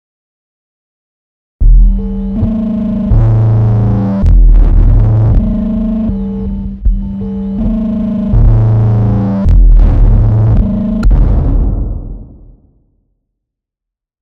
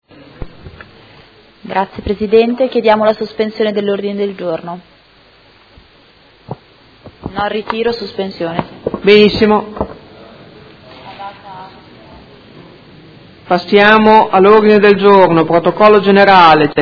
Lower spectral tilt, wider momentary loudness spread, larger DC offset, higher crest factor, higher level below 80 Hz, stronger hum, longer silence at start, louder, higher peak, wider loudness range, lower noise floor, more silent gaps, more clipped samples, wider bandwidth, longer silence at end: first, -11.5 dB/octave vs -7.5 dB/octave; second, 9 LU vs 23 LU; neither; about the same, 10 dB vs 12 dB; first, -12 dBFS vs -42 dBFS; neither; first, 1.6 s vs 0.4 s; about the same, -12 LUFS vs -10 LUFS; about the same, 0 dBFS vs 0 dBFS; second, 5 LU vs 17 LU; first, -82 dBFS vs -46 dBFS; neither; second, under 0.1% vs 0.6%; second, 2.9 kHz vs 5.4 kHz; first, 2 s vs 0 s